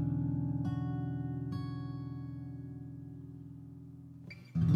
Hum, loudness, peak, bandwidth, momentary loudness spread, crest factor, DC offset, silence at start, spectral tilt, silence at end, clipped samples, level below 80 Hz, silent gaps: none; -39 LUFS; -16 dBFS; 6 kHz; 16 LU; 20 dB; under 0.1%; 0 s; -10 dB/octave; 0 s; under 0.1%; -56 dBFS; none